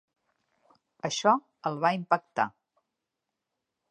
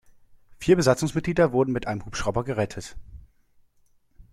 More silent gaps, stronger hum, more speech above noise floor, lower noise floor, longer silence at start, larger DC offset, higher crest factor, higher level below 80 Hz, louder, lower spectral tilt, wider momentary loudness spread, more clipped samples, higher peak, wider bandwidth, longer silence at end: neither; neither; first, 58 dB vs 38 dB; first, -86 dBFS vs -62 dBFS; first, 1.05 s vs 0.5 s; neither; about the same, 24 dB vs 20 dB; second, -82 dBFS vs -46 dBFS; second, -28 LUFS vs -24 LUFS; second, -4 dB/octave vs -6 dB/octave; about the same, 9 LU vs 11 LU; neither; about the same, -8 dBFS vs -6 dBFS; second, 10.5 kHz vs 14.5 kHz; first, 1.4 s vs 0.1 s